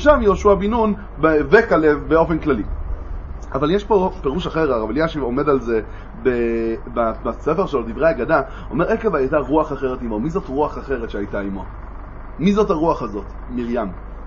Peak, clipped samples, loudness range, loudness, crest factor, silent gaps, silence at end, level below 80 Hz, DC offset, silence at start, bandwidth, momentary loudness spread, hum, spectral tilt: 0 dBFS; under 0.1%; 5 LU; -19 LUFS; 18 dB; none; 0 s; -32 dBFS; under 0.1%; 0 s; 7.2 kHz; 13 LU; none; -7.5 dB/octave